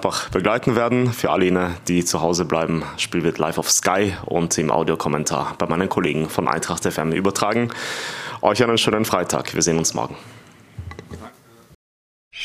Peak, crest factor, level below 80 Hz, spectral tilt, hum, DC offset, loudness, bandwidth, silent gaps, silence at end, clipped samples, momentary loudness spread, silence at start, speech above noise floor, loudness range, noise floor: 0 dBFS; 20 dB; -48 dBFS; -4 dB/octave; none; under 0.1%; -20 LUFS; 15.5 kHz; 11.75-12.31 s; 0 s; under 0.1%; 10 LU; 0 s; 25 dB; 2 LU; -45 dBFS